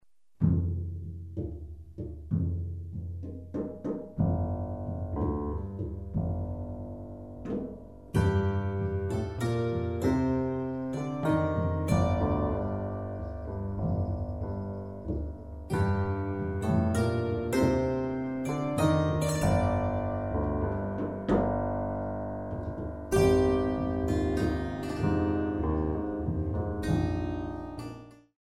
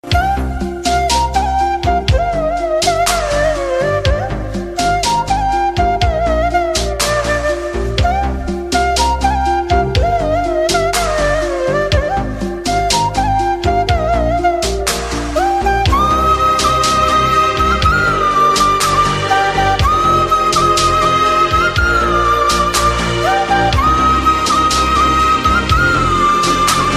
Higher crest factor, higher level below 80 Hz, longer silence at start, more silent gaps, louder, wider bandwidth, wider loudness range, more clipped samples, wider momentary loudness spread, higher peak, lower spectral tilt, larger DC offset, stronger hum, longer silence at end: about the same, 18 dB vs 14 dB; second, -42 dBFS vs -24 dBFS; first, 0.4 s vs 0.05 s; neither; second, -31 LUFS vs -13 LUFS; about the same, 14.5 kHz vs 15 kHz; about the same, 6 LU vs 4 LU; neither; first, 12 LU vs 5 LU; second, -12 dBFS vs 0 dBFS; first, -8 dB/octave vs -4 dB/octave; first, 0.1% vs under 0.1%; neither; first, 0.2 s vs 0 s